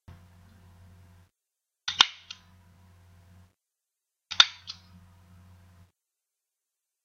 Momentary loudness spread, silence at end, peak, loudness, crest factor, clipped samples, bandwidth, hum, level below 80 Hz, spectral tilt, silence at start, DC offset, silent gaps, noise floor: 25 LU; 2.35 s; 0 dBFS; -23 LUFS; 34 dB; under 0.1%; 16 kHz; none; -68 dBFS; 1 dB/octave; 1.85 s; under 0.1%; none; -87 dBFS